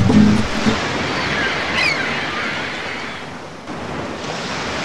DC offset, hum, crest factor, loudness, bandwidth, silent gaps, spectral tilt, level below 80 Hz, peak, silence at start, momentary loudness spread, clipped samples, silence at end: under 0.1%; none; 20 dB; -19 LUFS; 12 kHz; none; -5 dB/octave; -38 dBFS; 0 dBFS; 0 s; 13 LU; under 0.1%; 0 s